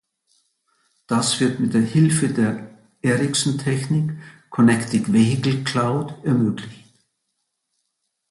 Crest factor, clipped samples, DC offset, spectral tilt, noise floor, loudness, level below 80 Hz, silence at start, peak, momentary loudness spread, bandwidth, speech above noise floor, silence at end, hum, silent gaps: 16 dB; under 0.1%; under 0.1%; -5.5 dB/octave; -75 dBFS; -20 LUFS; -58 dBFS; 1.1 s; -4 dBFS; 9 LU; 11.5 kHz; 56 dB; 1.55 s; none; none